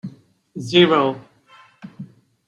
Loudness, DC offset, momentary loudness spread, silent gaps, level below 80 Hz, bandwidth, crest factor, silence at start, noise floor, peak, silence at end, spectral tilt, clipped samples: -16 LUFS; under 0.1%; 26 LU; none; -66 dBFS; 9.8 kHz; 20 dB; 0.05 s; -51 dBFS; -2 dBFS; 0.4 s; -6 dB/octave; under 0.1%